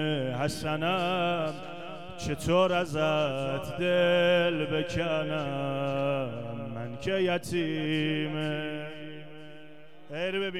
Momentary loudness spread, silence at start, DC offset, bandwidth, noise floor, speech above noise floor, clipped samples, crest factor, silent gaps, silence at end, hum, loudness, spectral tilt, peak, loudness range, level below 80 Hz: 16 LU; 0 s; 0.5%; 14.5 kHz; -52 dBFS; 23 dB; under 0.1%; 18 dB; none; 0 s; none; -29 LUFS; -5.5 dB/octave; -12 dBFS; 5 LU; -58 dBFS